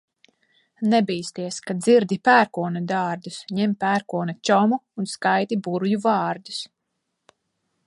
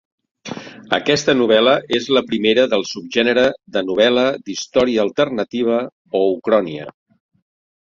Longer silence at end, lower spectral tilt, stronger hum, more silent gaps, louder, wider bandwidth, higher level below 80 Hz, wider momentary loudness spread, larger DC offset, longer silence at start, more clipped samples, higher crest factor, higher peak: first, 1.2 s vs 1.05 s; first, -5.5 dB/octave vs -4 dB/octave; neither; second, none vs 5.92-6.05 s; second, -22 LUFS vs -17 LUFS; first, 11.5 kHz vs 7.6 kHz; second, -72 dBFS vs -56 dBFS; second, 12 LU vs 15 LU; neither; first, 0.8 s vs 0.45 s; neither; about the same, 20 dB vs 18 dB; about the same, -2 dBFS vs 0 dBFS